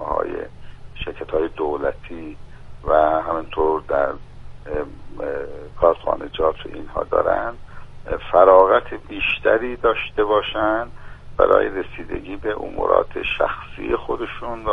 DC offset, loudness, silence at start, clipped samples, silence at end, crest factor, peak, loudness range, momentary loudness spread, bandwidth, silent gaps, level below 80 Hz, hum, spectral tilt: under 0.1%; -20 LUFS; 0 s; under 0.1%; 0 s; 20 dB; 0 dBFS; 6 LU; 16 LU; 5.4 kHz; none; -38 dBFS; none; -7 dB/octave